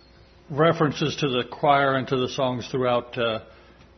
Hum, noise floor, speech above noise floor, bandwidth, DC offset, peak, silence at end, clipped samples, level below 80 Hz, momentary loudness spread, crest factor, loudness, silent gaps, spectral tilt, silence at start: none; -52 dBFS; 29 dB; 6.4 kHz; under 0.1%; -6 dBFS; 0.55 s; under 0.1%; -56 dBFS; 6 LU; 20 dB; -24 LUFS; none; -5.5 dB/octave; 0.5 s